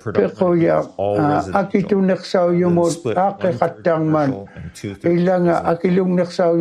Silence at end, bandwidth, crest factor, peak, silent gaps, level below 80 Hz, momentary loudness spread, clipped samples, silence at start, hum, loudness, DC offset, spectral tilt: 0 s; 11.5 kHz; 16 dB; 0 dBFS; none; -56 dBFS; 5 LU; under 0.1%; 0.05 s; none; -18 LUFS; under 0.1%; -7.5 dB/octave